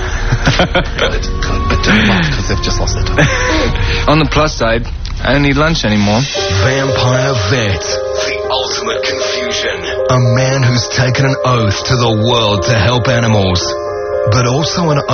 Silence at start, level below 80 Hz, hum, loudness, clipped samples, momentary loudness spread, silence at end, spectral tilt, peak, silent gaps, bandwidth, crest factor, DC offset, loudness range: 0 s; -22 dBFS; none; -13 LUFS; under 0.1%; 5 LU; 0 s; -5 dB/octave; 0 dBFS; none; 6.8 kHz; 12 dB; under 0.1%; 2 LU